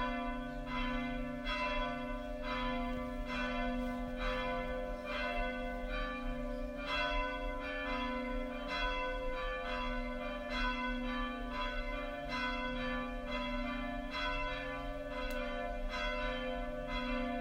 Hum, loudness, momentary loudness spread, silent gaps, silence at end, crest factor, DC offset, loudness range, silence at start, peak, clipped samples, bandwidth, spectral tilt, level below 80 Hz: none; -39 LUFS; 5 LU; none; 0 s; 14 dB; under 0.1%; 1 LU; 0 s; -24 dBFS; under 0.1%; 15.5 kHz; -5.5 dB/octave; -44 dBFS